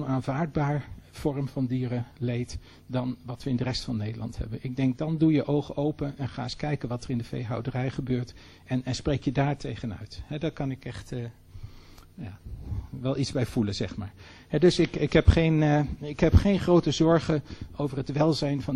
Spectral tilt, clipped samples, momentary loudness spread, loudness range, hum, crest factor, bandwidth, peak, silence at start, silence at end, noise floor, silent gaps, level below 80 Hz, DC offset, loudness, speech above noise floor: -7 dB/octave; under 0.1%; 16 LU; 10 LU; none; 22 dB; 11.5 kHz; -6 dBFS; 0 s; 0 s; -49 dBFS; none; -40 dBFS; under 0.1%; -28 LUFS; 22 dB